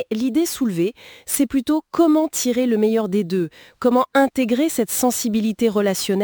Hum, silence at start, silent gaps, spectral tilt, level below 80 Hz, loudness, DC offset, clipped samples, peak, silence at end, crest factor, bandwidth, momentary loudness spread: none; 0 s; none; -4.5 dB/octave; -56 dBFS; -19 LUFS; under 0.1%; under 0.1%; -4 dBFS; 0 s; 14 dB; over 20 kHz; 7 LU